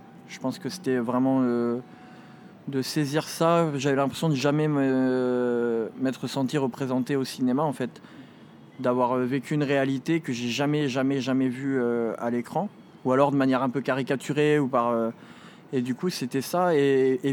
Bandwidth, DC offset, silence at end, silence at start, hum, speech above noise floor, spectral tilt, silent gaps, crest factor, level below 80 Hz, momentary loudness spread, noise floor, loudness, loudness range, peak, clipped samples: 17.5 kHz; under 0.1%; 0 s; 0 s; none; 24 dB; -6 dB/octave; none; 18 dB; -78 dBFS; 9 LU; -49 dBFS; -26 LUFS; 3 LU; -6 dBFS; under 0.1%